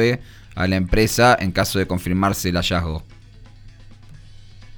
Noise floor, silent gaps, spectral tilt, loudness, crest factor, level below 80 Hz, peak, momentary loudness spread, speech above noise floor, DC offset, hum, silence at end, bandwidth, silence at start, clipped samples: -43 dBFS; none; -5 dB/octave; -19 LUFS; 18 dB; -34 dBFS; -4 dBFS; 13 LU; 24 dB; under 0.1%; none; 0 s; over 20 kHz; 0 s; under 0.1%